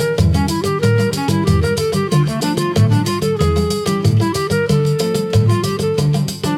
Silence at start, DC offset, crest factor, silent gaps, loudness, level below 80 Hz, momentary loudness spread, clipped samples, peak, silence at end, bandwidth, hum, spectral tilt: 0 s; under 0.1%; 12 dB; none; -16 LUFS; -36 dBFS; 3 LU; under 0.1%; -2 dBFS; 0 s; 16 kHz; none; -6 dB/octave